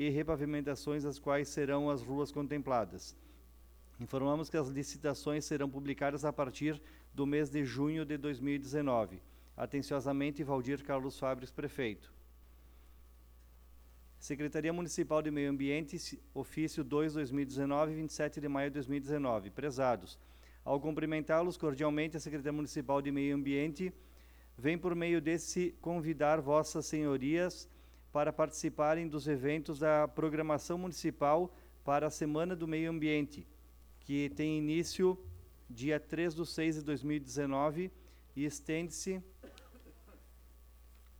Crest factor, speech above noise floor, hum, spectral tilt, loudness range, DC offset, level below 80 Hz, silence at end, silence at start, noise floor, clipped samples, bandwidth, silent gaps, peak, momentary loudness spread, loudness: 20 dB; 24 dB; none; -6 dB/octave; 5 LU; under 0.1%; -60 dBFS; 0 s; 0 s; -59 dBFS; under 0.1%; over 20 kHz; none; -18 dBFS; 10 LU; -36 LUFS